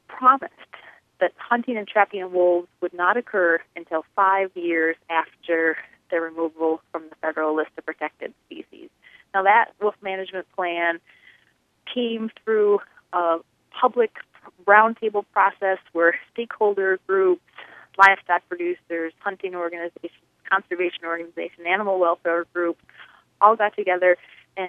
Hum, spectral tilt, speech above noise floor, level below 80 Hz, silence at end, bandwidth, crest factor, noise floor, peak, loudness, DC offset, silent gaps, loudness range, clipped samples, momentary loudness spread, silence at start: none; -5.5 dB/octave; 42 dB; -76 dBFS; 0 s; 8.2 kHz; 22 dB; -64 dBFS; 0 dBFS; -22 LUFS; under 0.1%; none; 5 LU; under 0.1%; 14 LU; 0.1 s